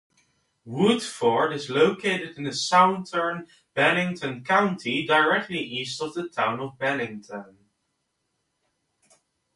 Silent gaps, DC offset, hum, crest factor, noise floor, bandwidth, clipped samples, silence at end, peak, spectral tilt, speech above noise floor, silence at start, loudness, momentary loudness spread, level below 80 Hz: none; under 0.1%; none; 22 dB; -76 dBFS; 11.5 kHz; under 0.1%; 2.15 s; -4 dBFS; -4.5 dB/octave; 52 dB; 0.65 s; -24 LUFS; 12 LU; -70 dBFS